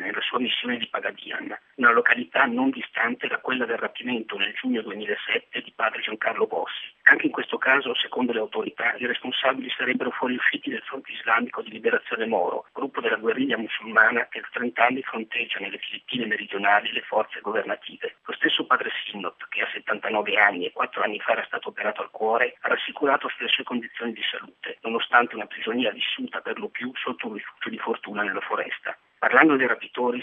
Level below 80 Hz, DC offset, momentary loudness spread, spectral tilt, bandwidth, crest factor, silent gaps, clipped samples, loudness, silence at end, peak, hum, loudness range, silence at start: -82 dBFS; under 0.1%; 12 LU; -6 dB/octave; 5.6 kHz; 26 dB; none; under 0.1%; -24 LUFS; 0 s; 0 dBFS; none; 4 LU; 0 s